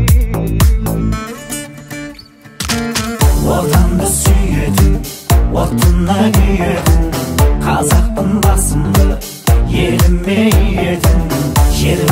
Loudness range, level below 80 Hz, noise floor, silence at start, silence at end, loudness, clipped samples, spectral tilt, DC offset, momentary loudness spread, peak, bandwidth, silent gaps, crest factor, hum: 4 LU; -14 dBFS; -36 dBFS; 0 s; 0 s; -13 LUFS; under 0.1%; -5.5 dB/octave; under 0.1%; 8 LU; 0 dBFS; 16.5 kHz; none; 12 dB; none